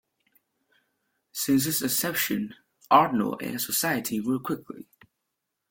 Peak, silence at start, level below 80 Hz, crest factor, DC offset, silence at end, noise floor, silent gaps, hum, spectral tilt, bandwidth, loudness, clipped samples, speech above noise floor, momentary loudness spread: -4 dBFS; 1.35 s; -66 dBFS; 24 dB; under 0.1%; 0.85 s; -82 dBFS; none; none; -3.5 dB/octave; 17 kHz; -25 LUFS; under 0.1%; 56 dB; 15 LU